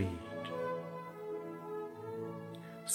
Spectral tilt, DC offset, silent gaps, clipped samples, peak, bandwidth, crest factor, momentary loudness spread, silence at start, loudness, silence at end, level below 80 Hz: -4.5 dB/octave; under 0.1%; none; under 0.1%; -20 dBFS; 18.5 kHz; 20 dB; 6 LU; 0 s; -43 LUFS; 0 s; -68 dBFS